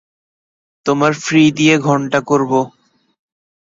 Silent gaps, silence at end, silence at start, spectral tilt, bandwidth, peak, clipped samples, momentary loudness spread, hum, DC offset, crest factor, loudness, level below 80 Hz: none; 1 s; 0.85 s; -5 dB/octave; 7.8 kHz; 0 dBFS; under 0.1%; 8 LU; none; under 0.1%; 16 dB; -14 LUFS; -58 dBFS